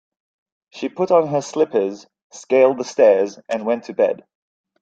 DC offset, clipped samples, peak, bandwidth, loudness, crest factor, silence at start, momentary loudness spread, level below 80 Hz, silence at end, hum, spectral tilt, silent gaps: under 0.1%; under 0.1%; -2 dBFS; 7.8 kHz; -18 LUFS; 16 dB; 0.75 s; 13 LU; -70 dBFS; 0.65 s; none; -5.5 dB/octave; 2.22-2.30 s